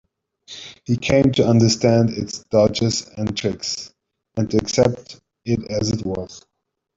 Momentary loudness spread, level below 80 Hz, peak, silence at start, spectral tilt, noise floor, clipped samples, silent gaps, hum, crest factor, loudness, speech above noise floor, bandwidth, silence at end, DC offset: 18 LU; -48 dBFS; -2 dBFS; 0.5 s; -5.5 dB/octave; -45 dBFS; under 0.1%; none; none; 18 dB; -20 LUFS; 26 dB; 7.8 kHz; 0.6 s; under 0.1%